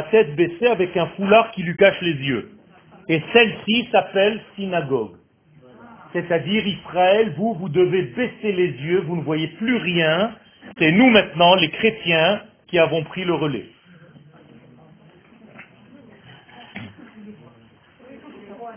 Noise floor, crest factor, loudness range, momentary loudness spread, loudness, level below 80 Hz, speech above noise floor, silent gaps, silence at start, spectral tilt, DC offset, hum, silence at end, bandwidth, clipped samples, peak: -52 dBFS; 20 dB; 7 LU; 12 LU; -19 LUFS; -58 dBFS; 33 dB; none; 0 s; -9.5 dB/octave; under 0.1%; none; 0 s; 3.6 kHz; under 0.1%; 0 dBFS